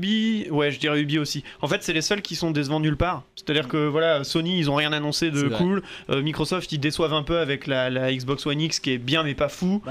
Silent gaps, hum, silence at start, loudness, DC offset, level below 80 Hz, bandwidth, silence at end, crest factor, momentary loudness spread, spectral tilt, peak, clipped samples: none; none; 0 s; -24 LUFS; under 0.1%; -46 dBFS; 15 kHz; 0 s; 14 dB; 4 LU; -5 dB/octave; -10 dBFS; under 0.1%